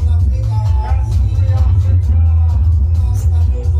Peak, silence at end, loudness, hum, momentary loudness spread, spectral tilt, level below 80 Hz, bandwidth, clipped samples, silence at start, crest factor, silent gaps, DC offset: -4 dBFS; 0 s; -14 LUFS; none; 3 LU; -8.5 dB/octave; -16 dBFS; 6.6 kHz; under 0.1%; 0 s; 8 dB; none; under 0.1%